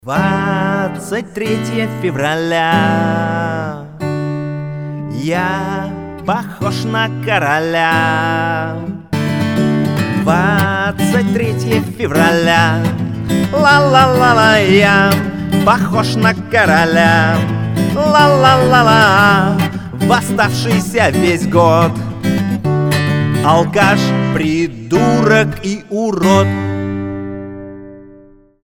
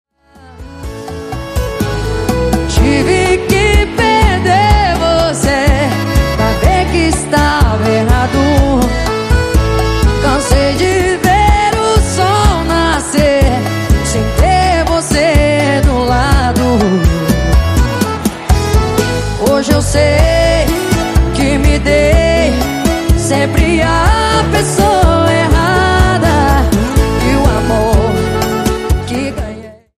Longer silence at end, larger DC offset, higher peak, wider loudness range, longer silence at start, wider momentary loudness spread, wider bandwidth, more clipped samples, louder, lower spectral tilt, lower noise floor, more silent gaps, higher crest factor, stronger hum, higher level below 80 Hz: first, 0.55 s vs 0.25 s; neither; about the same, 0 dBFS vs 0 dBFS; first, 7 LU vs 2 LU; second, 0.05 s vs 0.45 s; first, 12 LU vs 6 LU; first, 19.5 kHz vs 15.5 kHz; neither; about the same, -13 LUFS vs -11 LUFS; about the same, -6 dB/octave vs -5.5 dB/octave; first, -43 dBFS vs -39 dBFS; neither; about the same, 14 dB vs 10 dB; neither; second, -40 dBFS vs -16 dBFS